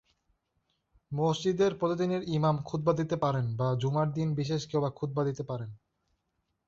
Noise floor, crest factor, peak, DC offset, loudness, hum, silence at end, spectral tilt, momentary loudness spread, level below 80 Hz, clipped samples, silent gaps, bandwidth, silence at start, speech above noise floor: -80 dBFS; 18 dB; -14 dBFS; under 0.1%; -30 LUFS; none; 0.9 s; -7 dB/octave; 6 LU; -62 dBFS; under 0.1%; none; 7.6 kHz; 1.1 s; 50 dB